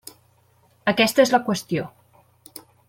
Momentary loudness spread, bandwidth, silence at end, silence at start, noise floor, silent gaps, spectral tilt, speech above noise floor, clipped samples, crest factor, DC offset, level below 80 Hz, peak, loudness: 25 LU; 16.5 kHz; 1 s; 0.85 s; -60 dBFS; none; -4 dB/octave; 40 dB; under 0.1%; 20 dB; under 0.1%; -64 dBFS; -4 dBFS; -21 LUFS